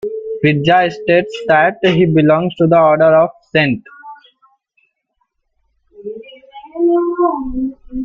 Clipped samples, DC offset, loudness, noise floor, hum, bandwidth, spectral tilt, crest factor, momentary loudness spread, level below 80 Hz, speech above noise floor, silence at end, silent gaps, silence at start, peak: under 0.1%; under 0.1%; -13 LUFS; -68 dBFS; none; 7.4 kHz; -8 dB/octave; 14 dB; 17 LU; -44 dBFS; 55 dB; 0 s; none; 0.05 s; 0 dBFS